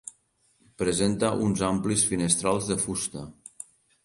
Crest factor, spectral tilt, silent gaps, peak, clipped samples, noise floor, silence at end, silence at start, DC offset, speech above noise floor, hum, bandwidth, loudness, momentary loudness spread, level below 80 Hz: 22 dB; -4 dB/octave; none; -6 dBFS; under 0.1%; -67 dBFS; 0.4 s; 0.05 s; under 0.1%; 41 dB; none; 11.5 kHz; -25 LUFS; 20 LU; -52 dBFS